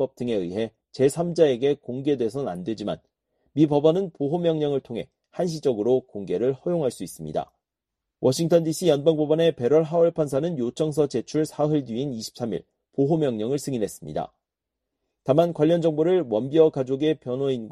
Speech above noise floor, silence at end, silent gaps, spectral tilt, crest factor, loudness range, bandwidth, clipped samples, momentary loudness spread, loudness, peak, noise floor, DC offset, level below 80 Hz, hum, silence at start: 62 dB; 0 s; none; -6.5 dB/octave; 18 dB; 5 LU; 13 kHz; under 0.1%; 12 LU; -24 LUFS; -4 dBFS; -85 dBFS; under 0.1%; -62 dBFS; none; 0 s